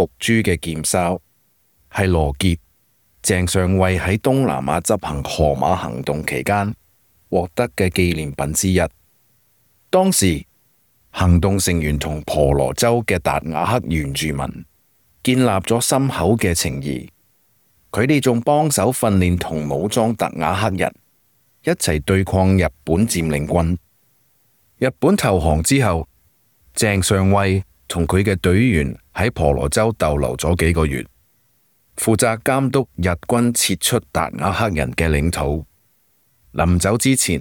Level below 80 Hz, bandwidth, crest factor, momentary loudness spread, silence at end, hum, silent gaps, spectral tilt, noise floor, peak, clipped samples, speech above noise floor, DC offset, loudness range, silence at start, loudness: -36 dBFS; 19.5 kHz; 16 dB; 8 LU; 0 s; none; none; -5 dB/octave; -61 dBFS; -2 dBFS; under 0.1%; 43 dB; under 0.1%; 2 LU; 0 s; -18 LUFS